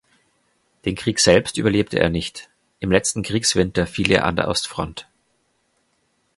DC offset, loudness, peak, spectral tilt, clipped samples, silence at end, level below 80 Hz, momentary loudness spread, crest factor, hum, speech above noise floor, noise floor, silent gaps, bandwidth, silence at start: under 0.1%; -20 LUFS; 0 dBFS; -4 dB/octave; under 0.1%; 1.35 s; -42 dBFS; 14 LU; 22 dB; none; 47 dB; -67 dBFS; none; 11.5 kHz; 0.85 s